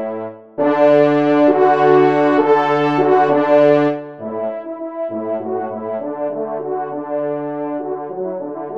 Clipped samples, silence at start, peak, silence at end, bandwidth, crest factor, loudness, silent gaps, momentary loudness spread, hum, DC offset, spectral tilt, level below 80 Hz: under 0.1%; 0 s; -2 dBFS; 0 s; 7 kHz; 14 dB; -16 LUFS; none; 13 LU; none; 0.2%; -8 dB/octave; -68 dBFS